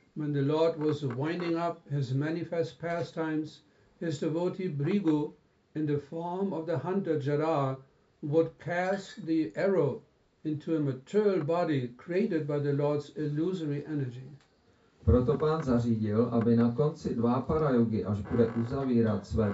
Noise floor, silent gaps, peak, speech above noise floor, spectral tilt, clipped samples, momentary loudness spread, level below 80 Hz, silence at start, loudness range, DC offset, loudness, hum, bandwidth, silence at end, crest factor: -65 dBFS; none; -12 dBFS; 36 dB; -7.5 dB/octave; under 0.1%; 8 LU; -52 dBFS; 0.15 s; 5 LU; under 0.1%; -30 LUFS; none; 8 kHz; 0 s; 18 dB